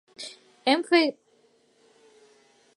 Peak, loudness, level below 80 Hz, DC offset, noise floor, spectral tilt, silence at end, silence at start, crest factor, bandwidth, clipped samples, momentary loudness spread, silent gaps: -6 dBFS; -24 LUFS; -86 dBFS; under 0.1%; -63 dBFS; -2.5 dB/octave; 1.65 s; 0.2 s; 22 dB; 11.5 kHz; under 0.1%; 19 LU; none